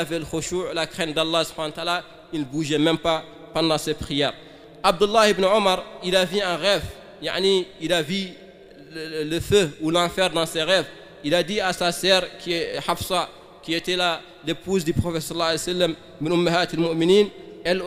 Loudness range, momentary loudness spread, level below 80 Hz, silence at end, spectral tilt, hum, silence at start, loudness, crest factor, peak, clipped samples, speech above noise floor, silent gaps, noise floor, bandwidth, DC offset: 3 LU; 11 LU; -48 dBFS; 0 s; -4 dB/octave; none; 0 s; -22 LUFS; 20 dB; -2 dBFS; under 0.1%; 23 dB; none; -45 dBFS; 15.5 kHz; under 0.1%